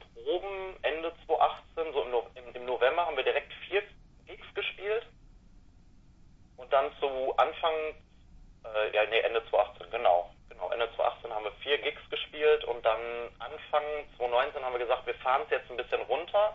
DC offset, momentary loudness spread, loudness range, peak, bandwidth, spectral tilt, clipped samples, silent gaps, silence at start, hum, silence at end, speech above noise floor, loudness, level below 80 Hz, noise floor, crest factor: under 0.1%; 11 LU; 4 LU; -12 dBFS; 6.2 kHz; -5 dB/octave; under 0.1%; none; 0 s; none; 0 s; 27 dB; -31 LUFS; -58 dBFS; -57 dBFS; 20 dB